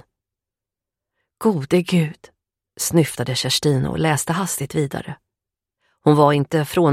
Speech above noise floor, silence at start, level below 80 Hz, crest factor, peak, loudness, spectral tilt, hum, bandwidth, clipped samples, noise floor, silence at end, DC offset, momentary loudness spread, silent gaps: 69 dB; 1.4 s; -52 dBFS; 20 dB; 0 dBFS; -19 LUFS; -5 dB/octave; none; 16 kHz; under 0.1%; -88 dBFS; 0 s; under 0.1%; 10 LU; none